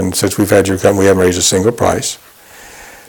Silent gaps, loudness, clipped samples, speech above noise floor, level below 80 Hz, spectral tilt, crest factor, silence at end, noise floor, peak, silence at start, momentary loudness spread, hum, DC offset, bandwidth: none; -12 LUFS; under 0.1%; 25 dB; -42 dBFS; -4 dB/octave; 14 dB; 0.1 s; -37 dBFS; 0 dBFS; 0 s; 7 LU; none; under 0.1%; 19.5 kHz